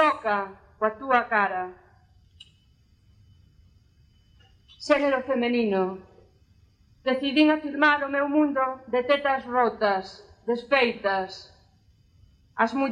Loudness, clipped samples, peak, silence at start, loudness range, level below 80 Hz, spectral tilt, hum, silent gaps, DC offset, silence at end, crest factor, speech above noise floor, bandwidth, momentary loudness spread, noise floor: -24 LUFS; under 0.1%; -8 dBFS; 0 s; 7 LU; -62 dBFS; -5 dB/octave; none; none; under 0.1%; 0 s; 20 dB; 36 dB; 9.6 kHz; 15 LU; -60 dBFS